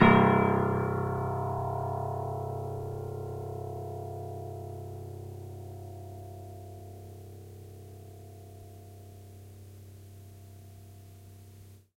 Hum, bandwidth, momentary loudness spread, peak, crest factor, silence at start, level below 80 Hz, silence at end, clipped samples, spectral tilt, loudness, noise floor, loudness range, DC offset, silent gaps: none; 16.5 kHz; 22 LU; -6 dBFS; 26 dB; 0 s; -58 dBFS; 0.25 s; under 0.1%; -8 dB/octave; -32 LUFS; -52 dBFS; 18 LU; under 0.1%; none